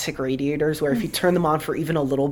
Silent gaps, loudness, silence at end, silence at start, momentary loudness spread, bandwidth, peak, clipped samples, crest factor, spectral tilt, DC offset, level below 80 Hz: none; -22 LUFS; 0 s; 0 s; 4 LU; 19 kHz; -8 dBFS; under 0.1%; 14 dB; -5.5 dB/octave; under 0.1%; -48 dBFS